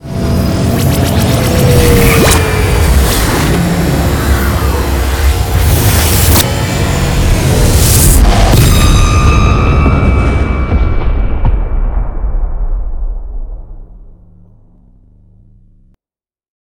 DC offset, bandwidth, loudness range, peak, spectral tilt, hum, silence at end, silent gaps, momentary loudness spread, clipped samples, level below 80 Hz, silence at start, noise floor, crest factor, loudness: under 0.1%; over 20 kHz; 13 LU; 0 dBFS; -5 dB/octave; none; 2.55 s; none; 12 LU; 0.4%; -14 dBFS; 0.05 s; under -90 dBFS; 10 dB; -10 LUFS